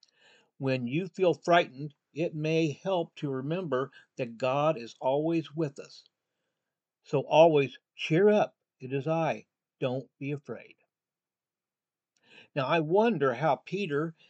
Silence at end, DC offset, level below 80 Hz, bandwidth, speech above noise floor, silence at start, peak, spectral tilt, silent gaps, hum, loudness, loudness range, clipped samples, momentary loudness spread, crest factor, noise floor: 0.2 s; under 0.1%; -88 dBFS; 8.2 kHz; over 62 dB; 0.6 s; -8 dBFS; -7 dB/octave; none; none; -29 LUFS; 9 LU; under 0.1%; 14 LU; 20 dB; under -90 dBFS